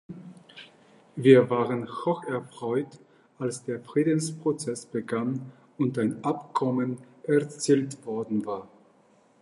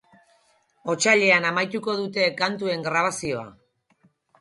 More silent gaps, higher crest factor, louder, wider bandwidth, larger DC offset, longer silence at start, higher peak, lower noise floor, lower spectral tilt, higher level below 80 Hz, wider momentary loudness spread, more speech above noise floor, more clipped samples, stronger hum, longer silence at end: neither; about the same, 24 dB vs 20 dB; second, -27 LUFS vs -22 LUFS; about the same, 11.5 kHz vs 11.5 kHz; neither; second, 0.1 s vs 0.85 s; about the same, -4 dBFS vs -6 dBFS; about the same, -61 dBFS vs -64 dBFS; first, -6 dB/octave vs -3 dB/octave; second, -74 dBFS vs -66 dBFS; first, 16 LU vs 13 LU; second, 35 dB vs 41 dB; neither; neither; second, 0.75 s vs 0.9 s